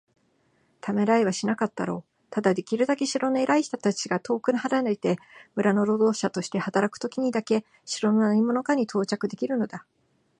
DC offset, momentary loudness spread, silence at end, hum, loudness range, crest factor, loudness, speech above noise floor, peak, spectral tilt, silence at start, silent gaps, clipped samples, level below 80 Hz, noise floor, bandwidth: under 0.1%; 9 LU; 0.6 s; none; 1 LU; 18 dB; -25 LUFS; 42 dB; -8 dBFS; -5.5 dB/octave; 0.85 s; none; under 0.1%; -74 dBFS; -67 dBFS; 10 kHz